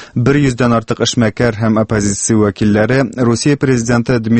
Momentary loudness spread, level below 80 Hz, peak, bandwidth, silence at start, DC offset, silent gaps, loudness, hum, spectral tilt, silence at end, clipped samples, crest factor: 2 LU; -38 dBFS; 0 dBFS; 8.8 kHz; 0 s; under 0.1%; none; -13 LUFS; none; -5.5 dB/octave; 0 s; under 0.1%; 12 dB